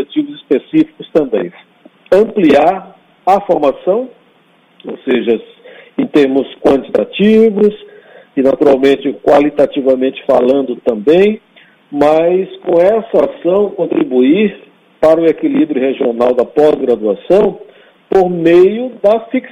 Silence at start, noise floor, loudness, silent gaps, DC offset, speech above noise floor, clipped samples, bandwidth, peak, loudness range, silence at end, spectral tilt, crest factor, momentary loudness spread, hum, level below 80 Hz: 0 s; -50 dBFS; -12 LUFS; none; under 0.1%; 39 dB; under 0.1%; 9.6 kHz; 0 dBFS; 3 LU; 0.05 s; -7.5 dB/octave; 12 dB; 9 LU; none; -50 dBFS